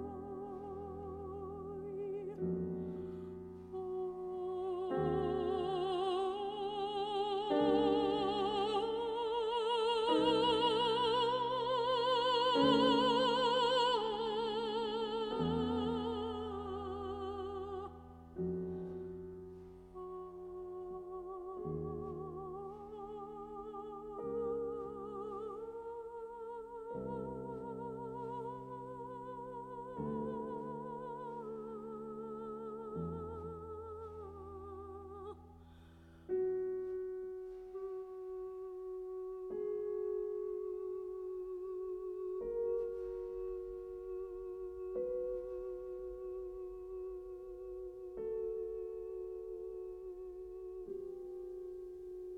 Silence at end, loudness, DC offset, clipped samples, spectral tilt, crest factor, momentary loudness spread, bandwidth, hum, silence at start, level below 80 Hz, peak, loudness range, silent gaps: 0 s; -39 LUFS; under 0.1%; under 0.1%; -6 dB/octave; 22 dB; 16 LU; 10.5 kHz; none; 0 s; -62 dBFS; -18 dBFS; 13 LU; none